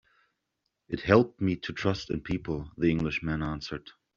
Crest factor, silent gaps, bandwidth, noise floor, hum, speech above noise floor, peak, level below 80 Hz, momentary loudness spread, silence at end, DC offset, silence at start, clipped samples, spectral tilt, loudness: 26 dB; none; 7.4 kHz; -82 dBFS; none; 53 dB; -4 dBFS; -50 dBFS; 13 LU; 0.25 s; under 0.1%; 0.9 s; under 0.1%; -5.5 dB/octave; -29 LUFS